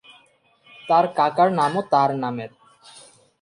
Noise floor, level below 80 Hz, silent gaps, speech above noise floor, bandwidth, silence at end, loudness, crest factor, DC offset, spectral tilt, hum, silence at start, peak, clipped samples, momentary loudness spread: -59 dBFS; -72 dBFS; none; 39 dB; 11 kHz; 0.4 s; -20 LUFS; 18 dB; under 0.1%; -6 dB/octave; none; 0.85 s; -4 dBFS; under 0.1%; 16 LU